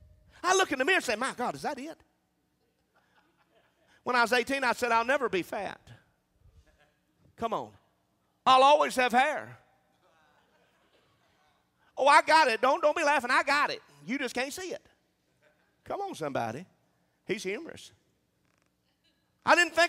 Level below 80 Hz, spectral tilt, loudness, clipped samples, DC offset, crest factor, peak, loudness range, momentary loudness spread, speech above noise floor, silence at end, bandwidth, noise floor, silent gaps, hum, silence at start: -70 dBFS; -2.5 dB/octave; -27 LUFS; under 0.1%; under 0.1%; 24 dB; -6 dBFS; 12 LU; 18 LU; 47 dB; 0 s; 16 kHz; -74 dBFS; none; none; 0.45 s